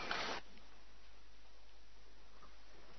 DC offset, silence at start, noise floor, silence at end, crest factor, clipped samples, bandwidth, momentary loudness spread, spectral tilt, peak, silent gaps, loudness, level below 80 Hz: 0.5%; 0 s; -64 dBFS; 0 s; 28 dB; under 0.1%; 6.2 kHz; 23 LU; -0.5 dB/octave; -22 dBFS; none; -43 LUFS; -66 dBFS